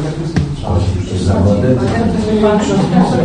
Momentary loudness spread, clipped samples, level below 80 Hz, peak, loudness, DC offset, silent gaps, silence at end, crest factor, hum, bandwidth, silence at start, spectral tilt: 6 LU; under 0.1%; -26 dBFS; 0 dBFS; -14 LUFS; under 0.1%; none; 0 s; 12 dB; none; 10 kHz; 0 s; -7.5 dB/octave